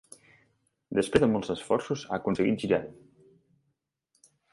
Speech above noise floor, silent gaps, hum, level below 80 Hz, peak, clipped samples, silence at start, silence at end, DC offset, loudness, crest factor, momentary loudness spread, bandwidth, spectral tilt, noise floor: 52 dB; none; none; -58 dBFS; -8 dBFS; under 0.1%; 0.9 s; 1.6 s; under 0.1%; -28 LUFS; 24 dB; 8 LU; 11.5 kHz; -6 dB/octave; -79 dBFS